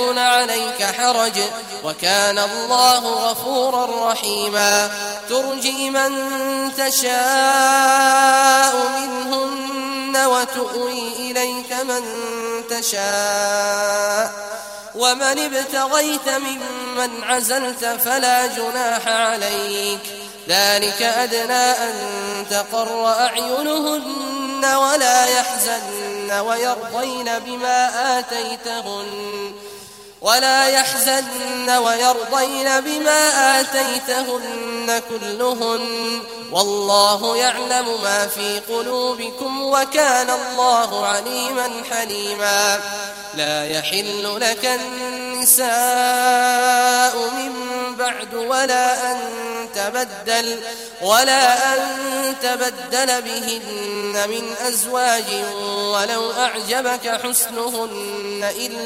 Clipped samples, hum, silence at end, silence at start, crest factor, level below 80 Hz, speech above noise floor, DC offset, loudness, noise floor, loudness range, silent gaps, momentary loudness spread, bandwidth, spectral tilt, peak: under 0.1%; none; 0 s; 0 s; 18 dB; -62 dBFS; 20 dB; under 0.1%; -18 LUFS; -39 dBFS; 5 LU; none; 11 LU; 16 kHz; -0.5 dB/octave; 0 dBFS